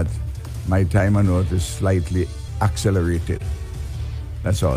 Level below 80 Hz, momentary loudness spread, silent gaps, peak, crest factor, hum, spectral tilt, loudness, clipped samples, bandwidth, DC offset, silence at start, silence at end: -30 dBFS; 12 LU; none; -6 dBFS; 14 dB; none; -6.5 dB/octave; -22 LUFS; under 0.1%; 15 kHz; under 0.1%; 0 s; 0 s